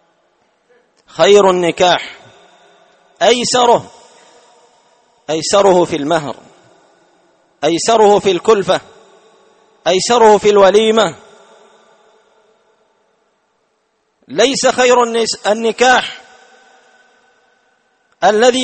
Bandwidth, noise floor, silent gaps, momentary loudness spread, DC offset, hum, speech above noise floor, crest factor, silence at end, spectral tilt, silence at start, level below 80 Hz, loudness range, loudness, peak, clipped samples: 8.8 kHz; -63 dBFS; none; 12 LU; under 0.1%; none; 52 dB; 14 dB; 0 s; -3 dB/octave; 1.15 s; -54 dBFS; 5 LU; -12 LUFS; 0 dBFS; under 0.1%